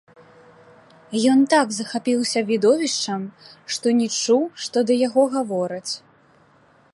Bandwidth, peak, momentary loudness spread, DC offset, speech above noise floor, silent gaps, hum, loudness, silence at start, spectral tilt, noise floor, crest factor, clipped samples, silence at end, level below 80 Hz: 11.5 kHz; -4 dBFS; 11 LU; under 0.1%; 35 dB; none; none; -21 LUFS; 1.1 s; -3.5 dB/octave; -56 dBFS; 16 dB; under 0.1%; 0.95 s; -74 dBFS